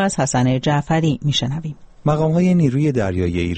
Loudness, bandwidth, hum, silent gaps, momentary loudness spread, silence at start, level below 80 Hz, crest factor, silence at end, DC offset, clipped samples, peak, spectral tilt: -18 LUFS; 8.8 kHz; none; none; 8 LU; 0 s; -42 dBFS; 14 dB; 0 s; under 0.1%; under 0.1%; -4 dBFS; -6 dB/octave